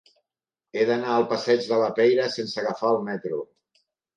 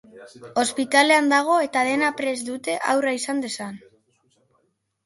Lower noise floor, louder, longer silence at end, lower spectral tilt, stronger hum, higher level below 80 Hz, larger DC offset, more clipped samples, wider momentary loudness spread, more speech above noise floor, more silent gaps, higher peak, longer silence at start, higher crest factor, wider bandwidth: first, -89 dBFS vs -69 dBFS; second, -24 LUFS vs -21 LUFS; second, 0.75 s vs 1.3 s; first, -5 dB/octave vs -2 dB/octave; neither; about the same, -76 dBFS vs -72 dBFS; neither; neither; about the same, 11 LU vs 12 LU; first, 66 dB vs 48 dB; neither; second, -8 dBFS vs -2 dBFS; first, 0.75 s vs 0.15 s; about the same, 16 dB vs 20 dB; second, 9.4 kHz vs 12 kHz